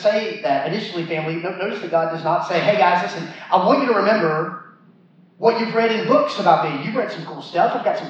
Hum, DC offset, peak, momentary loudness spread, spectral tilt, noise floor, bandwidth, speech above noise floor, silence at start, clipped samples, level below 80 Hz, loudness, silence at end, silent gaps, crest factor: none; under 0.1%; -2 dBFS; 9 LU; -6 dB/octave; -51 dBFS; 8 kHz; 32 dB; 0 s; under 0.1%; -90 dBFS; -19 LUFS; 0 s; none; 18 dB